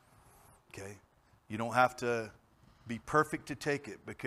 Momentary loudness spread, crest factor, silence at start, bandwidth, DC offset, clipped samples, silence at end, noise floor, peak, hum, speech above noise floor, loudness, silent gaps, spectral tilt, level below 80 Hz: 19 LU; 24 dB; 0.75 s; 15.5 kHz; under 0.1%; under 0.1%; 0 s; -62 dBFS; -12 dBFS; none; 28 dB; -34 LUFS; none; -5 dB/octave; -66 dBFS